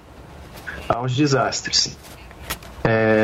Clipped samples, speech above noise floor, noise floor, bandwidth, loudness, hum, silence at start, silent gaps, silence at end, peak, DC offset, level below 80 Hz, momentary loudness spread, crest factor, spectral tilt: under 0.1%; 22 dB; -41 dBFS; 16 kHz; -21 LUFS; none; 0.1 s; none; 0 s; -4 dBFS; under 0.1%; -44 dBFS; 21 LU; 18 dB; -4 dB/octave